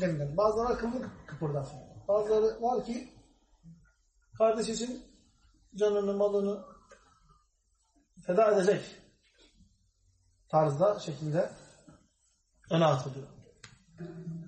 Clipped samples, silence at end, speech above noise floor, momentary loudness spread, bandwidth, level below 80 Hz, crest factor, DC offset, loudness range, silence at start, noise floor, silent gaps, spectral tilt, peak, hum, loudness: under 0.1%; 0 s; 44 dB; 17 LU; 8.4 kHz; -60 dBFS; 18 dB; under 0.1%; 4 LU; 0 s; -73 dBFS; none; -6 dB/octave; -14 dBFS; none; -30 LUFS